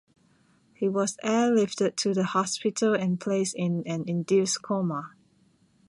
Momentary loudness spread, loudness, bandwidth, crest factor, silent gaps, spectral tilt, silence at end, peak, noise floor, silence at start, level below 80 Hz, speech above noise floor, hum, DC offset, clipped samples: 6 LU; -26 LUFS; 11.5 kHz; 16 dB; none; -5 dB/octave; 0.8 s; -12 dBFS; -64 dBFS; 0.8 s; -72 dBFS; 38 dB; none; under 0.1%; under 0.1%